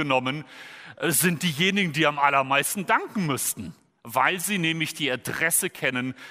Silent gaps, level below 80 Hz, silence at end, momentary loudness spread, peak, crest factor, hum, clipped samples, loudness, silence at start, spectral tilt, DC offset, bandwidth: none; -66 dBFS; 0 s; 10 LU; -6 dBFS; 20 dB; none; under 0.1%; -24 LUFS; 0 s; -3 dB/octave; under 0.1%; 16 kHz